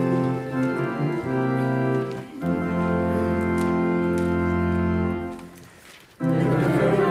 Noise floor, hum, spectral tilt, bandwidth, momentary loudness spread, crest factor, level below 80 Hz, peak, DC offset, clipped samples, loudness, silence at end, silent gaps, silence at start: -48 dBFS; none; -8.5 dB/octave; 14 kHz; 8 LU; 14 dB; -46 dBFS; -10 dBFS; under 0.1%; under 0.1%; -24 LUFS; 0 s; none; 0 s